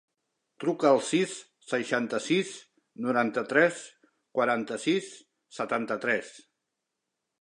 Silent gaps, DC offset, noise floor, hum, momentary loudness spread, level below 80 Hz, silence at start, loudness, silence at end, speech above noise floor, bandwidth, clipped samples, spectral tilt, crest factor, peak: none; under 0.1%; -84 dBFS; none; 18 LU; -82 dBFS; 0.6 s; -28 LUFS; 1 s; 57 dB; 11 kHz; under 0.1%; -4.5 dB/octave; 22 dB; -8 dBFS